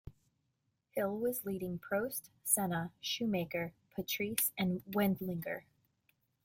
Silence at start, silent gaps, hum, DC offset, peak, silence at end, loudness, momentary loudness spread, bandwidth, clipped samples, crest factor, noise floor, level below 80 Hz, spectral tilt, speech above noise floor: 0.05 s; none; none; under 0.1%; -14 dBFS; 0.85 s; -36 LUFS; 9 LU; 16.5 kHz; under 0.1%; 24 dB; -82 dBFS; -68 dBFS; -4 dB/octave; 45 dB